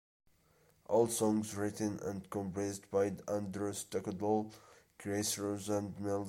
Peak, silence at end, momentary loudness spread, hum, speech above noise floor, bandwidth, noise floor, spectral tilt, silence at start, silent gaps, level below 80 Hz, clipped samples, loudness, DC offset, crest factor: -18 dBFS; 0 s; 8 LU; none; 34 dB; 16.5 kHz; -70 dBFS; -5 dB/octave; 0.9 s; none; -72 dBFS; under 0.1%; -36 LUFS; under 0.1%; 20 dB